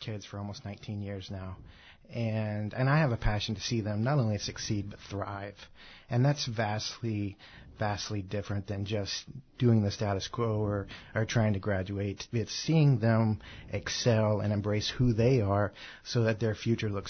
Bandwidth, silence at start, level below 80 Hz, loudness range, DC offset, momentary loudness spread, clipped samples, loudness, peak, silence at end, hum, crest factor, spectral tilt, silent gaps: 6.6 kHz; 0 s; -48 dBFS; 5 LU; under 0.1%; 13 LU; under 0.1%; -31 LUFS; -14 dBFS; 0 s; none; 16 dB; -6 dB/octave; none